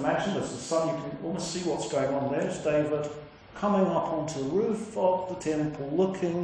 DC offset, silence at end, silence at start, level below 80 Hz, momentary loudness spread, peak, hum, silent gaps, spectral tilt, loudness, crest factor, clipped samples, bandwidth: under 0.1%; 0 s; 0 s; -60 dBFS; 6 LU; -12 dBFS; none; none; -5.5 dB/octave; -29 LUFS; 16 dB; under 0.1%; 10.5 kHz